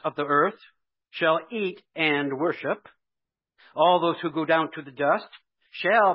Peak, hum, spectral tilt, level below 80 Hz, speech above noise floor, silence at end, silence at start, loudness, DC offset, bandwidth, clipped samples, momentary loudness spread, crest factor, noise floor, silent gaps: -8 dBFS; none; -9.5 dB/octave; -80 dBFS; 62 dB; 0 s; 0.05 s; -25 LUFS; under 0.1%; 5.8 kHz; under 0.1%; 11 LU; 18 dB; -86 dBFS; none